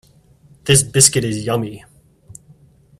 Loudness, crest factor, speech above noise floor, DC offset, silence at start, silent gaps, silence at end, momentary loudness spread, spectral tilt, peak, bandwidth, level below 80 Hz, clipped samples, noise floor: -14 LUFS; 20 dB; 34 dB; under 0.1%; 0.65 s; none; 1.2 s; 16 LU; -3 dB/octave; 0 dBFS; 15.5 kHz; -48 dBFS; under 0.1%; -50 dBFS